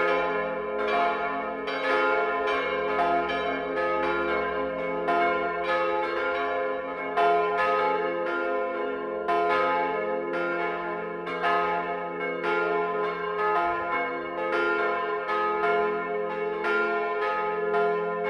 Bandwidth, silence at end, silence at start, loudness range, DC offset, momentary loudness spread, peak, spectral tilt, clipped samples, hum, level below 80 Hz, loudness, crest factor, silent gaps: 9.6 kHz; 0 s; 0 s; 2 LU; under 0.1%; 6 LU; -12 dBFS; -5.5 dB/octave; under 0.1%; none; -60 dBFS; -26 LUFS; 16 dB; none